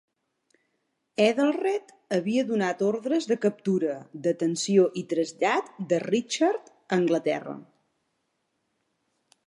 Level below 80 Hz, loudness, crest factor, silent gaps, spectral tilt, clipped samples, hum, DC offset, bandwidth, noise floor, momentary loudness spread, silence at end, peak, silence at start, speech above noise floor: -80 dBFS; -26 LUFS; 22 dB; none; -5 dB/octave; under 0.1%; none; under 0.1%; 11.5 kHz; -76 dBFS; 8 LU; 1.85 s; -6 dBFS; 1.2 s; 51 dB